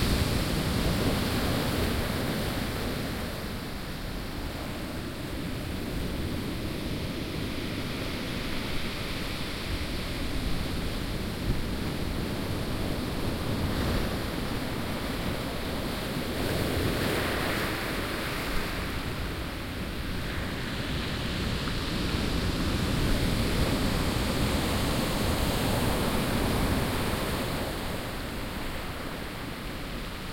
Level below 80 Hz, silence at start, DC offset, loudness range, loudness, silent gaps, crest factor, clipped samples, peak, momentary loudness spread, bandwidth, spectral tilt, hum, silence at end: -36 dBFS; 0 s; under 0.1%; 6 LU; -31 LUFS; none; 16 dB; under 0.1%; -12 dBFS; 8 LU; 16.5 kHz; -5 dB/octave; none; 0 s